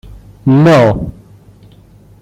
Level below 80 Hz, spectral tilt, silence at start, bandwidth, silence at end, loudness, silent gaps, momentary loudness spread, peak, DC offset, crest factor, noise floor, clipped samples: -36 dBFS; -8 dB/octave; 0.45 s; 11.5 kHz; 1.1 s; -10 LUFS; none; 14 LU; 0 dBFS; under 0.1%; 12 dB; -41 dBFS; under 0.1%